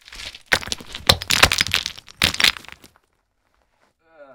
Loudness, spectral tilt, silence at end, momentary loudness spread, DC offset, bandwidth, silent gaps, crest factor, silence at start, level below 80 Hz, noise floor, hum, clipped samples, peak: -18 LUFS; -1.5 dB/octave; 0.1 s; 18 LU; under 0.1%; over 20 kHz; none; 24 dB; 0.1 s; -42 dBFS; -68 dBFS; none; under 0.1%; 0 dBFS